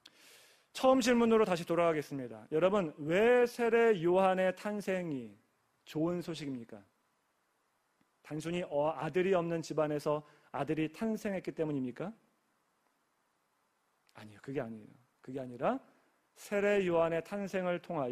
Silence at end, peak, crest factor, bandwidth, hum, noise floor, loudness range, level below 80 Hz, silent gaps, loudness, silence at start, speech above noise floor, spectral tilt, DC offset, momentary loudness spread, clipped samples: 0 s; -14 dBFS; 20 dB; 15 kHz; none; -78 dBFS; 13 LU; -70 dBFS; none; -33 LUFS; 0.75 s; 45 dB; -6 dB/octave; under 0.1%; 16 LU; under 0.1%